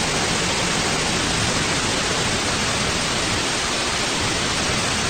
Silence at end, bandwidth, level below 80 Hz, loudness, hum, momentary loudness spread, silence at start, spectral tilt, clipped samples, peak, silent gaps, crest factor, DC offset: 0 s; 16.5 kHz; -38 dBFS; -20 LUFS; none; 1 LU; 0 s; -2.5 dB/octave; under 0.1%; -8 dBFS; none; 12 dB; under 0.1%